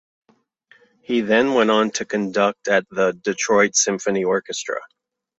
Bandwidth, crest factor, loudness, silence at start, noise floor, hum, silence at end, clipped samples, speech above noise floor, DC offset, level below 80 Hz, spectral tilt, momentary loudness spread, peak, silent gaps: 8.2 kHz; 18 dB; -20 LUFS; 1.1 s; -57 dBFS; none; 0.55 s; under 0.1%; 37 dB; under 0.1%; -64 dBFS; -3 dB/octave; 8 LU; -4 dBFS; none